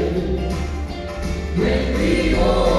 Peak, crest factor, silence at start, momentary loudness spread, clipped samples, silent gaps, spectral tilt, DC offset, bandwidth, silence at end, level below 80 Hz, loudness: -4 dBFS; 16 dB; 0 s; 10 LU; under 0.1%; none; -6.5 dB/octave; under 0.1%; 12.5 kHz; 0 s; -24 dBFS; -21 LUFS